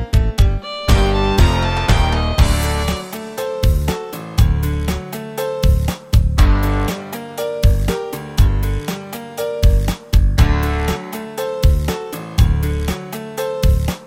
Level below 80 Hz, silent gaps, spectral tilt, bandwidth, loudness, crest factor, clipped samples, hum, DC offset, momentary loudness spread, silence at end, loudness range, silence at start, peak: -18 dBFS; none; -6 dB/octave; 16.5 kHz; -18 LUFS; 14 dB; under 0.1%; none; under 0.1%; 10 LU; 0 s; 3 LU; 0 s; 0 dBFS